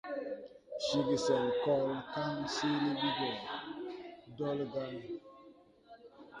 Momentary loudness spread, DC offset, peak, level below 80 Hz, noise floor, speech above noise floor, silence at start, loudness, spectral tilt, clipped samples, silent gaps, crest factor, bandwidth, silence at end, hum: 15 LU; under 0.1%; -18 dBFS; -72 dBFS; -60 dBFS; 26 dB; 0.05 s; -35 LUFS; -5 dB/octave; under 0.1%; none; 18 dB; 11 kHz; 0 s; none